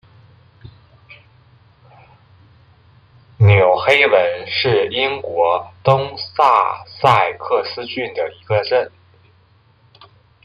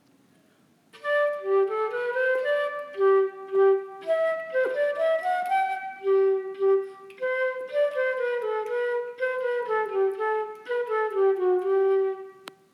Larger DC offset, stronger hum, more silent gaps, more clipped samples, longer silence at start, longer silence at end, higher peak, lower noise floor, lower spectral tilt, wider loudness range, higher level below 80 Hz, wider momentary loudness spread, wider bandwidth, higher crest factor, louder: neither; neither; neither; neither; second, 0.65 s vs 0.95 s; first, 1.55 s vs 0.25 s; first, 0 dBFS vs -12 dBFS; second, -53 dBFS vs -62 dBFS; first, -6.5 dB/octave vs -4.5 dB/octave; about the same, 5 LU vs 3 LU; first, -54 dBFS vs under -90 dBFS; first, 12 LU vs 7 LU; second, 8.2 kHz vs 11.5 kHz; about the same, 18 dB vs 14 dB; first, -16 LUFS vs -26 LUFS